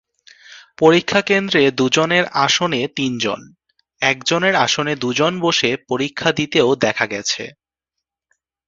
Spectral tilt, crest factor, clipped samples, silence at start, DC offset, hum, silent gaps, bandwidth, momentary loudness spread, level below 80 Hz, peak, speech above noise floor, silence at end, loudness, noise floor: -3.5 dB/octave; 18 dB; under 0.1%; 0.5 s; under 0.1%; none; none; 7.8 kHz; 7 LU; -58 dBFS; 0 dBFS; 65 dB; 1.2 s; -17 LUFS; -82 dBFS